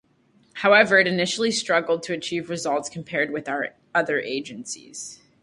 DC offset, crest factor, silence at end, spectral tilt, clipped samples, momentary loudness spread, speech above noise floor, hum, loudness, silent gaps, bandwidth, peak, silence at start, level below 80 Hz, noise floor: under 0.1%; 22 dB; 0.3 s; -3.5 dB/octave; under 0.1%; 17 LU; 38 dB; none; -22 LUFS; none; 11.5 kHz; -2 dBFS; 0.55 s; -68 dBFS; -61 dBFS